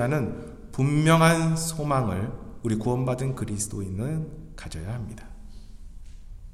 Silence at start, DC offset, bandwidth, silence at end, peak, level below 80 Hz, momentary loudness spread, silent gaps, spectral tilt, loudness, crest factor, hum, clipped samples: 0 s; under 0.1%; 14 kHz; 0 s; -4 dBFS; -44 dBFS; 19 LU; none; -5.5 dB/octave; -26 LUFS; 22 dB; none; under 0.1%